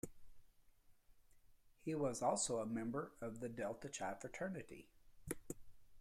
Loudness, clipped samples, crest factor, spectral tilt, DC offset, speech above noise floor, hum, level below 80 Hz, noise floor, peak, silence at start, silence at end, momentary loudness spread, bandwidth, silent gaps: -44 LUFS; under 0.1%; 20 dB; -4.5 dB/octave; under 0.1%; 25 dB; none; -68 dBFS; -69 dBFS; -26 dBFS; 0.05 s; 0 s; 16 LU; 16 kHz; none